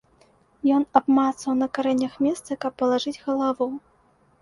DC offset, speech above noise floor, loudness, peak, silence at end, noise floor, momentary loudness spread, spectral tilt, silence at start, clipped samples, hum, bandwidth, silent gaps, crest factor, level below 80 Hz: under 0.1%; 38 dB; -23 LUFS; -2 dBFS; 0.65 s; -61 dBFS; 9 LU; -4.5 dB/octave; 0.65 s; under 0.1%; none; 11.5 kHz; none; 22 dB; -64 dBFS